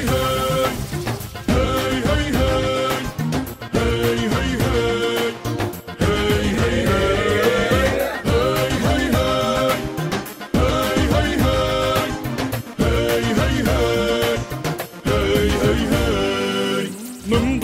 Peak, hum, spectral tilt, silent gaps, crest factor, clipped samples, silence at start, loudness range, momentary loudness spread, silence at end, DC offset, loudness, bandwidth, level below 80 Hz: -4 dBFS; none; -5 dB/octave; none; 14 dB; under 0.1%; 0 s; 2 LU; 7 LU; 0 s; under 0.1%; -20 LUFS; 16 kHz; -30 dBFS